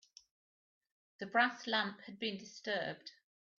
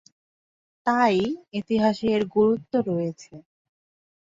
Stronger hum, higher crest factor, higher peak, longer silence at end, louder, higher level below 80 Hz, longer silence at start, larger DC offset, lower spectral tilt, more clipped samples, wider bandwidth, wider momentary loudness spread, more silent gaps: neither; first, 24 dB vs 18 dB; second, -16 dBFS vs -8 dBFS; second, 0.5 s vs 0.85 s; second, -37 LUFS vs -24 LUFS; second, -86 dBFS vs -62 dBFS; first, 1.2 s vs 0.85 s; neither; second, -1 dB/octave vs -6.5 dB/octave; neither; about the same, 7.4 kHz vs 7.6 kHz; first, 16 LU vs 10 LU; neither